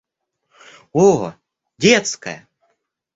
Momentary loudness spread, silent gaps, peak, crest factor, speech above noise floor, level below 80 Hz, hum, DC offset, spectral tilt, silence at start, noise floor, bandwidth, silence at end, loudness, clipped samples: 17 LU; none; -2 dBFS; 18 dB; 56 dB; -58 dBFS; none; under 0.1%; -4 dB/octave; 0.95 s; -72 dBFS; 8 kHz; 0.75 s; -16 LUFS; under 0.1%